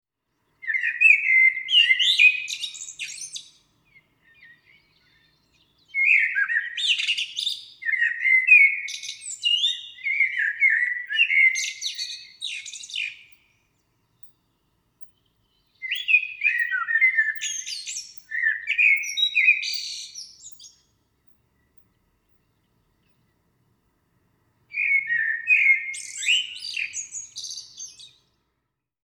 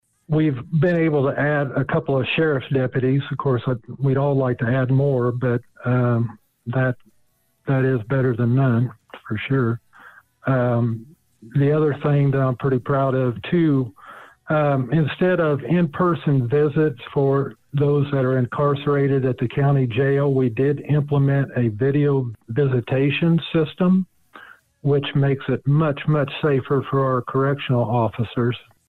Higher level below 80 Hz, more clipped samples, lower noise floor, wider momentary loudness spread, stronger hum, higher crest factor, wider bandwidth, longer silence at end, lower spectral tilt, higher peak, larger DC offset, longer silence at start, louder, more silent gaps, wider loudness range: second, -76 dBFS vs -54 dBFS; neither; first, -79 dBFS vs -63 dBFS; first, 18 LU vs 5 LU; neither; first, 20 dB vs 10 dB; first, 19.5 kHz vs 4.2 kHz; first, 0.95 s vs 0.3 s; second, 5 dB/octave vs -10 dB/octave; first, -4 dBFS vs -10 dBFS; neither; first, 0.65 s vs 0.3 s; about the same, -20 LUFS vs -21 LUFS; neither; first, 16 LU vs 3 LU